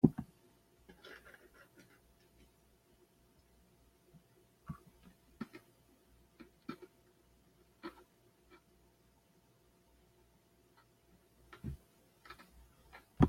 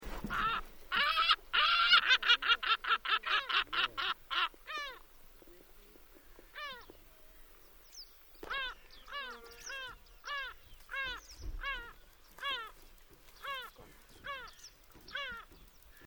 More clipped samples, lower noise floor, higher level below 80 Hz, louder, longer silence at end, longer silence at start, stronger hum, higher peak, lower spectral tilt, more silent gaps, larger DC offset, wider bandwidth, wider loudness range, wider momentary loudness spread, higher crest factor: neither; first, -70 dBFS vs -58 dBFS; about the same, -58 dBFS vs -56 dBFS; second, -48 LUFS vs -32 LUFS; about the same, 0 s vs 0 s; about the same, 0.05 s vs 0 s; first, 60 Hz at -75 dBFS vs none; about the same, -10 dBFS vs -12 dBFS; first, -8.5 dB/octave vs -1 dB/octave; neither; neither; second, 16.5 kHz vs over 20 kHz; second, 11 LU vs 18 LU; second, 18 LU vs 24 LU; first, 34 dB vs 26 dB